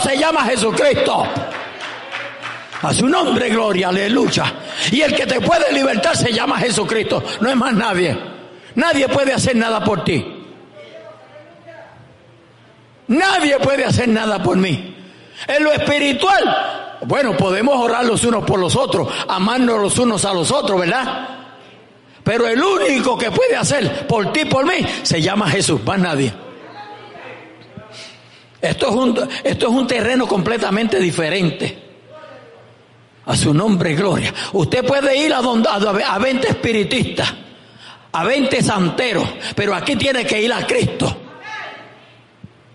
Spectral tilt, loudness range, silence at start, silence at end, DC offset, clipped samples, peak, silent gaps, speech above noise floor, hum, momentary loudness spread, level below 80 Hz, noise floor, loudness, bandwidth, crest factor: -4.5 dB/octave; 4 LU; 0 s; 0.85 s; under 0.1%; under 0.1%; -4 dBFS; none; 32 dB; none; 14 LU; -48 dBFS; -48 dBFS; -16 LUFS; 11.5 kHz; 12 dB